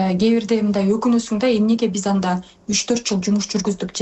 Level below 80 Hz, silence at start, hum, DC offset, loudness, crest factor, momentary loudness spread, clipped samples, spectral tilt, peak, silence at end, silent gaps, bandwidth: -52 dBFS; 0 s; none; under 0.1%; -19 LUFS; 10 dB; 5 LU; under 0.1%; -5 dB/octave; -8 dBFS; 0 s; none; 8.4 kHz